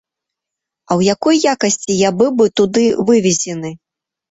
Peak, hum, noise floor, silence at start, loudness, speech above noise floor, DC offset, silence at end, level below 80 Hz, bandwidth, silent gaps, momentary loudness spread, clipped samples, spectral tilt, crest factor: 0 dBFS; none; -82 dBFS; 0.9 s; -14 LUFS; 68 dB; under 0.1%; 0.55 s; -54 dBFS; 8 kHz; none; 7 LU; under 0.1%; -4.5 dB/octave; 14 dB